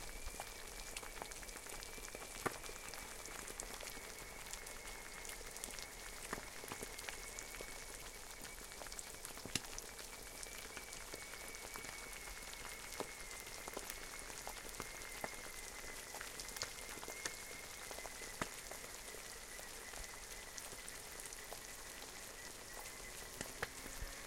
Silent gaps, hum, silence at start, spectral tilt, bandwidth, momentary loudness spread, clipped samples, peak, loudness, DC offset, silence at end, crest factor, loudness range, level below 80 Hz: none; none; 0 s; -1.5 dB/octave; 17 kHz; 4 LU; under 0.1%; -18 dBFS; -48 LUFS; under 0.1%; 0 s; 30 dB; 2 LU; -60 dBFS